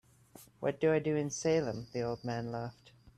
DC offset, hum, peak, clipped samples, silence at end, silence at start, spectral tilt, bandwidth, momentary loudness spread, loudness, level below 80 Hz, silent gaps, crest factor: under 0.1%; none; -18 dBFS; under 0.1%; 0.1 s; 0.35 s; -5.5 dB/octave; 13 kHz; 9 LU; -34 LUFS; -66 dBFS; none; 18 dB